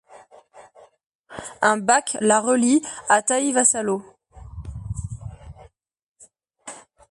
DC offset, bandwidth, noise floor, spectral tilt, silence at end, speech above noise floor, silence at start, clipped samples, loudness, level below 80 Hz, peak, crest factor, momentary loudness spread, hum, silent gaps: under 0.1%; 11.5 kHz; -55 dBFS; -3.5 dB/octave; 0.3 s; 35 dB; 0.1 s; under 0.1%; -20 LUFS; -46 dBFS; -2 dBFS; 22 dB; 22 LU; none; 1.06-1.24 s, 6.08-6.15 s